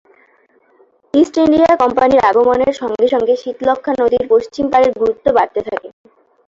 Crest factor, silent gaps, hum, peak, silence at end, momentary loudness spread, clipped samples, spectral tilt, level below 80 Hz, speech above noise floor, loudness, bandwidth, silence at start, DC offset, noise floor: 12 dB; none; none; -2 dBFS; 0.6 s; 7 LU; under 0.1%; -5.5 dB/octave; -48 dBFS; 41 dB; -14 LUFS; 7.6 kHz; 1.15 s; under 0.1%; -54 dBFS